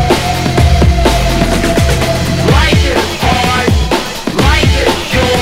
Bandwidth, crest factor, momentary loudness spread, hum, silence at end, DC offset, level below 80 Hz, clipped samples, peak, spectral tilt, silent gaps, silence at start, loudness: 16.5 kHz; 10 dB; 3 LU; none; 0 s; under 0.1%; -16 dBFS; 0.4%; 0 dBFS; -5 dB/octave; none; 0 s; -11 LUFS